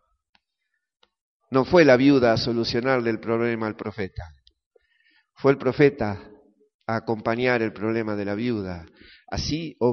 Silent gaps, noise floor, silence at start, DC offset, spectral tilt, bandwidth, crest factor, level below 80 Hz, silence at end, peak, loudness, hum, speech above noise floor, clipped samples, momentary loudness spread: 4.66-4.71 s, 6.74-6.79 s; -79 dBFS; 1.5 s; under 0.1%; -5 dB/octave; 6.6 kHz; 20 dB; -50 dBFS; 0 s; -4 dBFS; -23 LUFS; none; 57 dB; under 0.1%; 17 LU